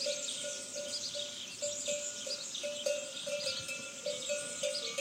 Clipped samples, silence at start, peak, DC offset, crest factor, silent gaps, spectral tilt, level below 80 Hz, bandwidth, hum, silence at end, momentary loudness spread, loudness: under 0.1%; 0 s; -20 dBFS; under 0.1%; 20 dB; none; 0 dB/octave; -80 dBFS; 16.5 kHz; none; 0 s; 4 LU; -37 LUFS